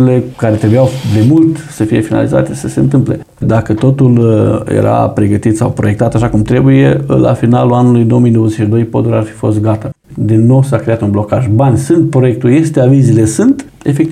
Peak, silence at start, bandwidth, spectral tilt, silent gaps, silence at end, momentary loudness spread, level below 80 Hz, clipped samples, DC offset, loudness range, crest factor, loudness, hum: 0 dBFS; 0 s; 13 kHz; -8 dB/octave; none; 0 s; 6 LU; -36 dBFS; under 0.1%; under 0.1%; 2 LU; 8 dB; -10 LUFS; none